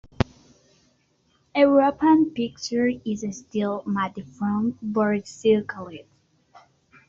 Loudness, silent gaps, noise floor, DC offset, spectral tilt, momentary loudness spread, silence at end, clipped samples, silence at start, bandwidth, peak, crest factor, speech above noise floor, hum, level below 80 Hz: -23 LUFS; none; -66 dBFS; under 0.1%; -5.5 dB/octave; 12 LU; 1.05 s; under 0.1%; 0.2 s; 7.6 kHz; -2 dBFS; 22 dB; 43 dB; none; -52 dBFS